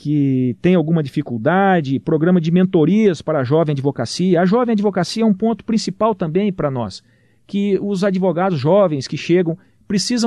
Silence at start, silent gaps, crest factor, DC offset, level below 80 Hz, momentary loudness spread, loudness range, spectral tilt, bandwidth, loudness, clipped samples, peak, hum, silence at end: 0.05 s; none; 12 dB; under 0.1%; -54 dBFS; 7 LU; 3 LU; -6.5 dB/octave; 11 kHz; -17 LUFS; under 0.1%; -4 dBFS; none; 0 s